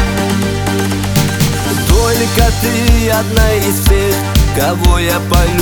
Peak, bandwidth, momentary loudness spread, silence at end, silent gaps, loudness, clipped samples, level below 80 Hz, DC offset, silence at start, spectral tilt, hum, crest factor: 0 dBFS; over 20 kHz; 3 LU; 0 s; none; -12 LUFS; under 0.1%; -16 dBFS; under 0.1%; 0 s; -4.5 dB/octave; none; 12 dB